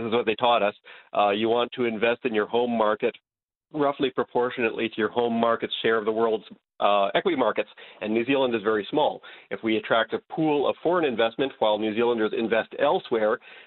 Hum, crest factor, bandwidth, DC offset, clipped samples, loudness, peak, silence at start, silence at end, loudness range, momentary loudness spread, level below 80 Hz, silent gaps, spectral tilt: none; 18 dB; 4.3 kHz; under 0.1%; under 0.1%; -25 LUFS; -6 dBFS; 0 s; 0.05 s; 2 LU; 5 LU; -68 dBFS; 3.43-3.47 s, 3.57-3.61 s; -9.5 dB/octave